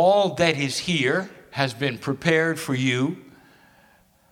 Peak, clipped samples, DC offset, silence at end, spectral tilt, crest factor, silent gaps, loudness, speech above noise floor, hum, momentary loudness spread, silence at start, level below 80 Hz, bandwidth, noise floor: -2 dBFS; under 0.1%; under 0.1%; 1.1 s; -5 dB/octave; 22 dB; none; -23 LUFS; 36 dB; none; 7 LU; 0 s; -60 dBFS; 17 kHz; -58 dBFS